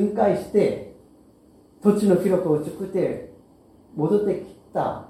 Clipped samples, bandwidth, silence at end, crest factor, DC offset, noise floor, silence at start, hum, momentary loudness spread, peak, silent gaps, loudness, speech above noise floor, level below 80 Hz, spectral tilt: under 0.1%; 14.5 kHz; 0.05 s; 20 dB; under 0.1%; -53 dBFS; 0 s; none; 13 LU; -4 dBFS; none; -23 LUFS; 32 dB; -58 dBFS; -8 dB/octave